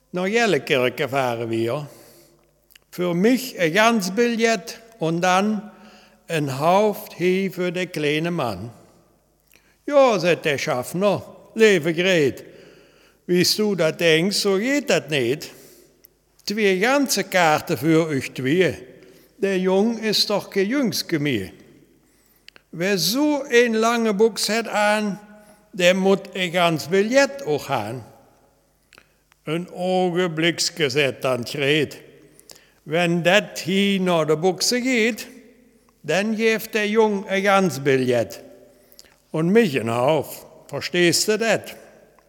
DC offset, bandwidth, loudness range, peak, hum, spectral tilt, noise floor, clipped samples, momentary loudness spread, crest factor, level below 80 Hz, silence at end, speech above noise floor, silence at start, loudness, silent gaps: under 0.1%; 19 kHz; 3 LU; -2 dBFS; none; -4.5 dB/octave; -60 dBFS; under 0.1%; 11 LU; 20 dB; -66 dBFS; 0.5 s; 40 dB; 0.15 s; -20 LUFS; none